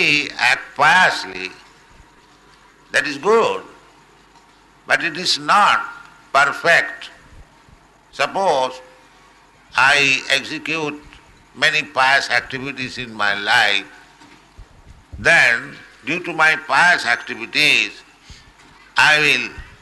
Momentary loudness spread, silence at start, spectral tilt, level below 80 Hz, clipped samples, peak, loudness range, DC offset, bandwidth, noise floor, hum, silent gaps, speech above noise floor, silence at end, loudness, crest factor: 15 LU; 0 s; -2 dB/octave; -52 dBFS; under 0.1%; -2 dBFS; 5 LU; under 0.1%; 12 kHz; -50 dBFS; none; none; 33 dB; 0.15 s; -16 LUFS; 16 dB